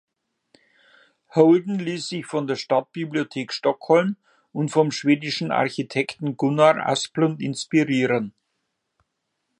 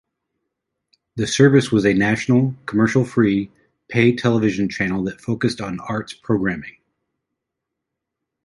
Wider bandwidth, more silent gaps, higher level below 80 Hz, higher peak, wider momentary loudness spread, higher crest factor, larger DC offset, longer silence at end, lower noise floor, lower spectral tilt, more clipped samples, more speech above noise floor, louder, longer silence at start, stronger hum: about the same, 11 kHz vs 11.5 kHz; neither; second, -72 dBFS vs -52 dBFS; about the same, -2 dBFS vs -2 dBFS; about the same, 11 LU vs 12 LU; about the same, 20 dB vs 18 dB; neither; second, 1.3 s vs 1.75 s; second, -77 dBFS vs -81 dBFS; about the same, -5.5 dB/octave vs -6 dB/octave; neither; second, 56 dB vs 63 dB; second, -22 LUFS vs -19 LUFS; first, 1.35 s vs 1.15 s; neither